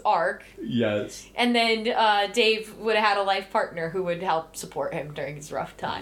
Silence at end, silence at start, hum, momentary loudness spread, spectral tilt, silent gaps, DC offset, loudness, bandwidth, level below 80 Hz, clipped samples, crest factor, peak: 0 s; 0 s; none; 12 LU; -4 dB/octave; none; under 0.1%; -25 LUFS; 16.5 kHz; -58 dBFS; under 0.1%; 18 dB; -8 dBFS